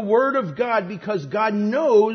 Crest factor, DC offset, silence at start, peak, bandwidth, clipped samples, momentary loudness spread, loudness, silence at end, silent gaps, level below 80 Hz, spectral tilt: 14 dB; under 0.1%; 0 s; -6 dBFS; 6.4 kHz; under 0.1%; 8 LU; -21 LUFS; 0 s; none; -66 dBFS; -7 dB/octave